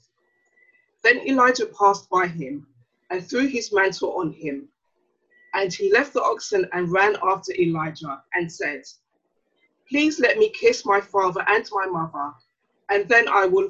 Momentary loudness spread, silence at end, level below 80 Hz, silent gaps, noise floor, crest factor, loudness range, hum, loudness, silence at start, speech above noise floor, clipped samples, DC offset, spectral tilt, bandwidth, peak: 14 LU; 0 s; -64 dBFS; none; -72 dBFS; 20 dB; 4 LU; none; -21 LUFS; 1.05 s; 51 dB; under 0.1%; under 0.1%; -4.5 dB/octave; 8 kHz; -4 dBFS